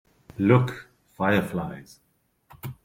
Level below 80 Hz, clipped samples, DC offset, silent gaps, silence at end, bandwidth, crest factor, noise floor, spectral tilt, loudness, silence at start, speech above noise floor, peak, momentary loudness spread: -58 dBFS; under 0.1%; under 0.1%; none; 0.1 s; 16 kHz; 22 dB; -56 dBFS; -8 dB/octave; -24 LUFS; 0.4 s; 33 dB; -4 dBFS; 22 LU